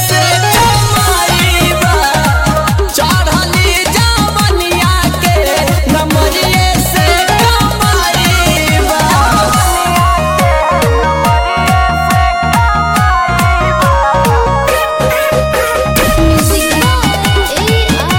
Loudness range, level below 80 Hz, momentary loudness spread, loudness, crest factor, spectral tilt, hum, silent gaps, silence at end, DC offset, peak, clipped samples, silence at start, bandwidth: 1 LU; -18 dBFS; 2 LU; -10 LUFS; 10 dB; -4 dB/octave; none; none; 0 s; under 0.1%; 0 dBFS; under 0.1%; 0 s; 17 kHz